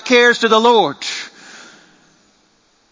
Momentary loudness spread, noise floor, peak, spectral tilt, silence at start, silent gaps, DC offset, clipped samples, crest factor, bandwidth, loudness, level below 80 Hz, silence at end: 15 LU; -57 dBFS; 0 dBFS; -2.5 dB/octave; 0.05 s; none; under 0.1%; under 0.1%; 16 dB; 7.6 kHz; -13 LUFS; -68 dBFS; 1.35 s